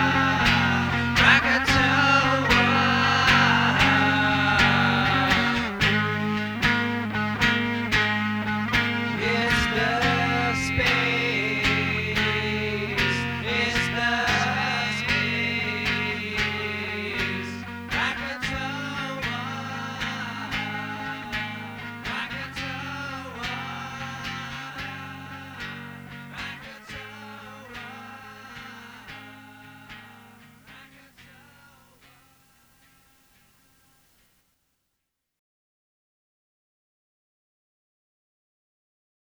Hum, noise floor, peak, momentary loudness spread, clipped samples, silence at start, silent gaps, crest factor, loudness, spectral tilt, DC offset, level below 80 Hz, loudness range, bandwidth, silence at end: none; -81 dBFS; -4 dBFS; 20 LU; under 0.1%; 0 s; none; 22 dB; -23 LUFS; -4.5 dB/octave; under 0.1%; -46 dBFS; 20 LU; over 20 kHz; 8.05 s